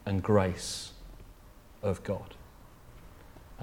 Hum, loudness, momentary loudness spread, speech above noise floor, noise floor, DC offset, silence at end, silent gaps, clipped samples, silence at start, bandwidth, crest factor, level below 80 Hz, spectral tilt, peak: none; -32 LUFS; 27 LU; 23 dB; -54 dBFS; under 0.1%; 0 s; none; under 0.1%; 0 s; 17 kHz; 22 dB; -52 dBFS; -5.5 dB/octave; -12 dBFS